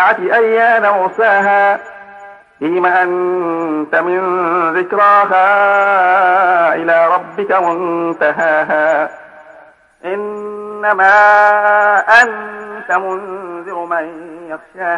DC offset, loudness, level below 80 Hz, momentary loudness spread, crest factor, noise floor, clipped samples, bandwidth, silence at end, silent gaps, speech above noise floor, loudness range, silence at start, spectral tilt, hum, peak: under 0.1%; -12 LUFS; -64 dBFS; 16 LU; 12 dB; -43 dBFS; under 0.1%; 10.5 kHz; 0 s; none; 30 dB; 5 LU; 0 s; -5 dB/octave; none; 0 dBFS